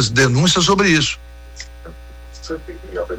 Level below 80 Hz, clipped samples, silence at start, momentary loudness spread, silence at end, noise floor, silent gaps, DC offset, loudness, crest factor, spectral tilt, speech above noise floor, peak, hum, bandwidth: -36 dBFS; under 0.1%; 0 s; 22 LU; 0 s; -36 dBFS; none; under 0.1%; -14 LUFS; 14 dB; -4 dB/octave; 20 dB; -4 dBFS; 60 Hz at -35 dBFS; 15.5 kHz